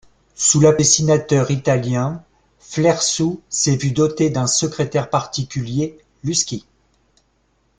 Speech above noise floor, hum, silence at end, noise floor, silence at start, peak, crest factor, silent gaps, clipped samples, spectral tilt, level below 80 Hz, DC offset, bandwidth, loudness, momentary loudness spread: 45 dB; none; 1.2 s; -63 dBFS; 0.4 s; -2 dBFS; 18 dB; none; under 0.1%; -4.5 dB/octave; -50 dBFS; under 0.1%; 10 kHz; -18 LUFS; 12 LU